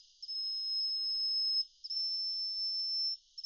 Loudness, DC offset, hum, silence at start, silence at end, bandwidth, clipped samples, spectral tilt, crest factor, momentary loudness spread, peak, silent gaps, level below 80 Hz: -32 LUFS; under 0.1%; none; 0.2 s; 0.05 s; 7.2 kHz; under 0.1%; 5 dB/octave; 10 dB; 5 LU; -26 dBFS; none; -78 dBFS